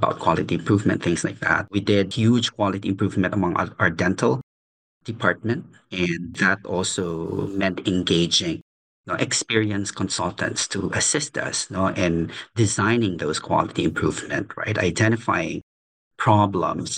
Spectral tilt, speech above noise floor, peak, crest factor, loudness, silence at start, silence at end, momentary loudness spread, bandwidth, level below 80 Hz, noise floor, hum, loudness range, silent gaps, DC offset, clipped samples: -4.5 dB/octave; over 68 dB; -4 dBFS; 20 dB; -22 LUFS; 0 s; 0 s; 7 LU; 10 kHz; -56 dBFS; under -90 dBFS; none; 2 LU; 4.43-5.01 s, 8.62-9.04 s, 15.63-16.11 s; under 0.1%; under 0.1%